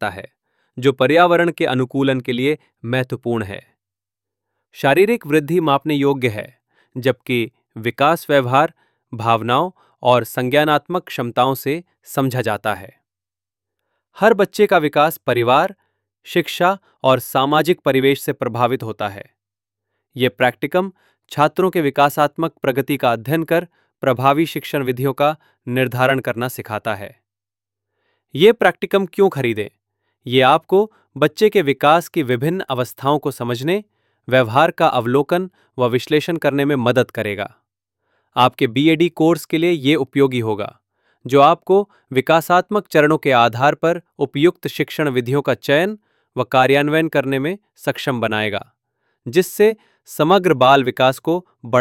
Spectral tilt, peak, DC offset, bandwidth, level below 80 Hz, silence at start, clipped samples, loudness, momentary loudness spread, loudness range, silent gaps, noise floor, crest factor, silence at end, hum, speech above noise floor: -6 dB/octave; 0 dBFS; under 0.1%; 17 kHz; -62 dBFS; 0 s; under 0.1%; -17 LUFS; 11 LU; 4 LU; none; under -90 dBFS; 18 dB; 0 s; none; over 73 dB